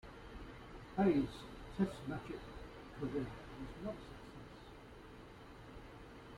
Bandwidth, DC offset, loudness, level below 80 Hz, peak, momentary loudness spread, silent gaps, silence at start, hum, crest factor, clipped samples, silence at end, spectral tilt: 13.5 kHz; under 0.1%; -42 LUFS; -58 dBFS; -22 dBFS; 20 LU; none; 0.05 s; none; 22 dB; under 0.1%; 0 s; -7.5 dB/octave